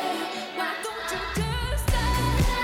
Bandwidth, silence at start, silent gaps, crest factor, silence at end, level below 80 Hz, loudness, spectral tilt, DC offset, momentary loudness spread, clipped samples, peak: 17.5 kHz; 0 s; none; 12 dB; 0 s; -30 dBFS; -27 LUFS; -4.5 dB/octave; under 0.1%; 6 LU; under 0.1%; -14 dBFS